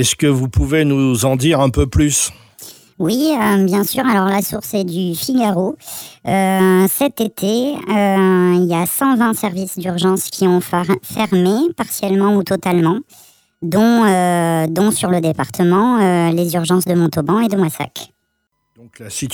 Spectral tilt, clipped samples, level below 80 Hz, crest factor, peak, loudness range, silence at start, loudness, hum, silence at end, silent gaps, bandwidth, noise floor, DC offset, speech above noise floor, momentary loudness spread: -5.5 dB/octave; under 0.1%; -36 dBFS; 14 dB; -2 dBFS; 2 LU; 0 s; -15 LUFS; none; 0 s; none; over 20 kHz; -69 dBFS; under 0.1%; 54 dB; 8 LU